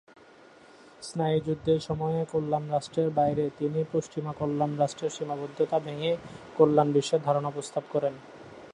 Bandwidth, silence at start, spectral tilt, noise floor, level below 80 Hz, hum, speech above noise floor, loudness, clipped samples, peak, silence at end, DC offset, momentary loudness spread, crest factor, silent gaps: 11 kHz; 1 s; -6.5 dB/octave; -54 dBFS; -62 dBFS; none; 26 dB; -28 LUFS; under 0.1%; -8 dBFS; 0 s; under 0.1%; 10 LU; 20 dB; none